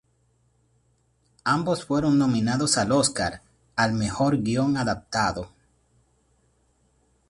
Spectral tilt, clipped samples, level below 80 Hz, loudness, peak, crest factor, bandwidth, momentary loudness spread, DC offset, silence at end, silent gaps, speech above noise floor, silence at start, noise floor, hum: -4.5 dB/octave; under 0.1%; -52 dBFS; -24 LUFS; -8 dBFS; 18 dB; 11.5 kHz; 10 LU; under 0.1%; 1.85 s; none; 43 dB; 1.45 s; -66 dBFS; none